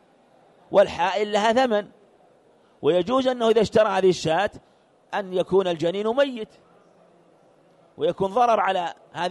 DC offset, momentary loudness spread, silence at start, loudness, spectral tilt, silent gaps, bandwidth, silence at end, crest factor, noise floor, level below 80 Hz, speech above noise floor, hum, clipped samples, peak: under 0.1%; 10 LU; 0.7 s; -22 LUFS; -5 dB/octave; none; 11.5 kHz; 0 s; 16 dB; -57 dBFS; -60 dBFS; 36 dB; none; under 0.1%; -6 dBFS